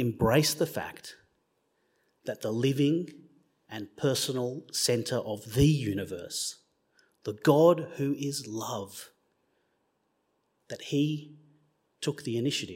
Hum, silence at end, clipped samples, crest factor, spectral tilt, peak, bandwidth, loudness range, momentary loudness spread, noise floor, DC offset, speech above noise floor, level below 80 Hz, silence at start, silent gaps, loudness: none; 0 s; under 0.1%; 24 dB; -5 dB/octave; -8 dBFS; 16.5 kHz; 9 LU; 18 LU; -75 dBFS; under 0.1%; 47 dB; -54 dBFS; 0 s; none; -29 LUFS